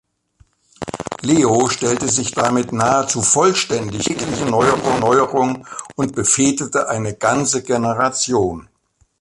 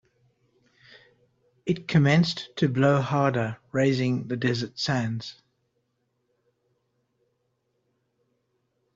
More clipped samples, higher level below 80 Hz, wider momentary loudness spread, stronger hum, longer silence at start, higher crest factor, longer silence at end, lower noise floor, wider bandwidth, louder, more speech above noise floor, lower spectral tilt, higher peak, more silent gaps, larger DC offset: neither; first, -48 dBFS vs -64 dBFS; about the same, 9 LU vs 9 LU; neither; second, 0.8 s vs 1.65 s; about the same, 18 dB vs 20 dB; second, 0.6 s vs 3.65 s; second, -55 dBFS vs -75 dBFS; first, 11.5 kHz vs 7.8 kHz; first, -17 LUFS vs -25 LUFS; second, 39 dB vs 51 dB; second, -3.5 dB/octave vs -6.5 dB/octave; first, 0 dBFS vs -8 dBFS; neither; neither